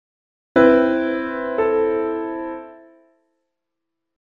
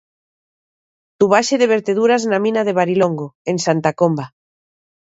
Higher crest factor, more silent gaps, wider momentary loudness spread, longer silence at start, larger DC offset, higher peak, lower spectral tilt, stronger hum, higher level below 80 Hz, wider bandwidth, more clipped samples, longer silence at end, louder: about the same, 20 dB vs 18 dB; second, none vs 3.35-3.45 s; first, 15 LU vs 8 LU; second, 0.55 s vs 1.2 s; neither; about the same, -2 dBFS vs 0 dBFS; first, -7.5 dB/octave vs -5 dB/octave; neither; first, -54 dBFS vs -66 dBFS; second, 6.8 kHz vs 8 kHz; neither; first, 1.45 s vs 0.8 s; about the same, -19 LUFS vs -17 LUFS